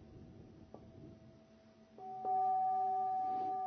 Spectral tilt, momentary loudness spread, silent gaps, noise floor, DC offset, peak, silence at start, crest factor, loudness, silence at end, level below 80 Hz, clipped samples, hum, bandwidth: -6 dB/octave; 23 LU; none; -63 dBFS; under 0.1%; -28 dBFS; 0 s; 10 dB; -36 LUFS; 0 s; -70 dBFS; under 0.1%; none; 6 kHz